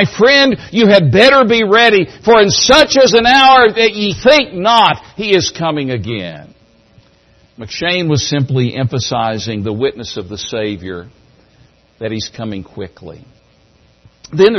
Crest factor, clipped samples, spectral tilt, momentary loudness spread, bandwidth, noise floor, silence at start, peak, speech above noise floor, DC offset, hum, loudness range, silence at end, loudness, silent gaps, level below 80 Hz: 12 dB; 0.1%; -4 dB/octave; 18 LU; 12 kHz; -50 dBFS; 0 s; 0 dBFS; 38 dB; under 0.1%; none; 16 LU; 0 s; -11 LUFS; none; -44 dBFS